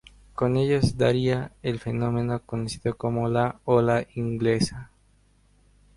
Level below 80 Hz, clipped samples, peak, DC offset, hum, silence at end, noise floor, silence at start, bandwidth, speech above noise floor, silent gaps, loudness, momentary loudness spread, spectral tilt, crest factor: -48 dBFS; under 0.1%; -6 dBFS; under 0.1%; 50 Hz at -50 dBFS; 1.1 s; -61 dBFS; 0.4 s; 11.5 kHz; 37 dB; none; -25 LUFS; 8 LU; -7 dB/octave; 18 dB